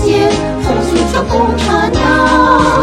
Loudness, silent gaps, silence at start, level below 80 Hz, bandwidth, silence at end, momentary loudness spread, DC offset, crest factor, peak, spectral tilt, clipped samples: -11 LUFS; none; 0 s; -24 dBFS; 15 kHz; 0 s; 5 LU; under 0.1%; 10 dB; 0 dBFS; -5.5 dB/octave; under 0.1%